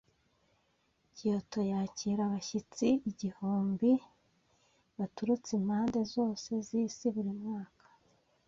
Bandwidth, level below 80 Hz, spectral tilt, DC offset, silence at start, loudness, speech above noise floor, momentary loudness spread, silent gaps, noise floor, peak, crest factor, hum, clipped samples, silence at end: 7.6 kHz; -70 dBFS; -6.5 dB/octave; under 0.1%; 1.15 s; -34 LUFS; 42 dB; 9 LU; none; -75 dBFS; -18 dBFS; 18 dB; none; under 0.1%; 0.8 s